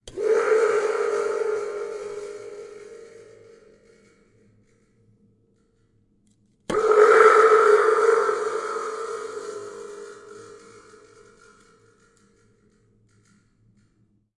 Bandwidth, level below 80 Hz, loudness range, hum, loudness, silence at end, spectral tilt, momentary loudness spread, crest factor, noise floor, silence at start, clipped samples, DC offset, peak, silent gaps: 11.5 kHz; -64 dBFS; 21 LU; none; -20 LUFS; 3.85 s; -3 dB/octave; 27 LU; 24 dB; -65 dBFS; 0.05 s; under 0.1%; under 0.1%; 0 dBFS; none